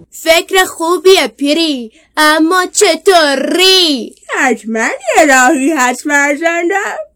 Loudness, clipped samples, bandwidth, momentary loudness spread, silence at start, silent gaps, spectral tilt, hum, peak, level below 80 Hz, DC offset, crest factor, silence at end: -10 LUFS; 0.5%; over 20 kHz; 8 LU; 0.15 s; none; -1 dB/octave; none; 0 dBFS; -50 dBFS; under 0.1%; 10 dB; 0.1 s